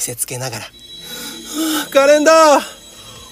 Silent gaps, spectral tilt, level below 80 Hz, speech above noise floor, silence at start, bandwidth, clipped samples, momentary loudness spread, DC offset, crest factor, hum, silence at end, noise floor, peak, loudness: none; -2.5 dB/octave; -54 dBFS; 24 dB; 0 s; 16 kHz; under 0.1%; 24 LU; under 0.1%; 16 dB; none; 0.05 s; -37 dBFS; 0 dBFS; -13 LUFS